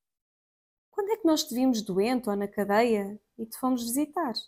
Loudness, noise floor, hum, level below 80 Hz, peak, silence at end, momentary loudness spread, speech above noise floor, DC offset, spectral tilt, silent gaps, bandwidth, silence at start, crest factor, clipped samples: -27 LUFS; under -90 dBFS; none; -68 dBFS; -12 dBFS; 0.05 s; 12 LU; over 63 dB; under 0.1%; -4.5 dB/octave; none; 16 kHz; 0.95 s; 16 dB; under 0.1%